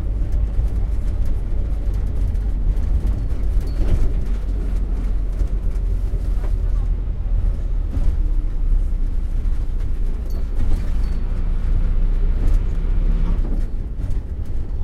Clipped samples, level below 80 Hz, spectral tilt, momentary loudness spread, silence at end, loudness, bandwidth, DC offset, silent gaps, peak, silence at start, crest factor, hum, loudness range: under 0.1%; -18 dBFS; -8.5 dB/octave; 4 LU; 0 s; -25 LUFS; 4.7 kHz; under 0.1%; none; -6 dBFS; 0 s; 12 dB; none; 2 LU